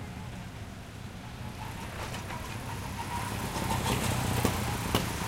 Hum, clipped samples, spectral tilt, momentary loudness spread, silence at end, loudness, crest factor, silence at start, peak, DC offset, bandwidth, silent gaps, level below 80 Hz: none; under 0.1%; -4.5 dB/octave; 13 LU; 0 s; -34 LUFS; 24 dB; 0 s; -10 dBFS; under 0.1%; 16.5 kHz; none; -44 dBFS